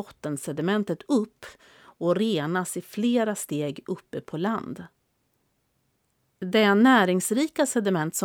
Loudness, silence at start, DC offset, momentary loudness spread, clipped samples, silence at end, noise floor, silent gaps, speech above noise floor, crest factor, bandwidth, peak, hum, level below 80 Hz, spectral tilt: -25 LUFS; 0 s; under 0.1%; 16 LU; under 0.1%; 0 s; -72 dBFS; none; 47 dB; 20 dB; 20 kHz; -6 dBFS; none; -72 dBFS; -4.5 dB/octave